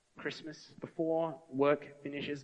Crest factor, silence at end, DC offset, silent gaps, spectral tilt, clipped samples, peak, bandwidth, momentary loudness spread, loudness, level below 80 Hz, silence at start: 18 dB; 0 s; under 0.1%; none; -6 dB/octave; under 0.1%; -18 dBFS; 8.6 kHz; 15 LU; -35 LUFS; -78 dBFS; 0.15 s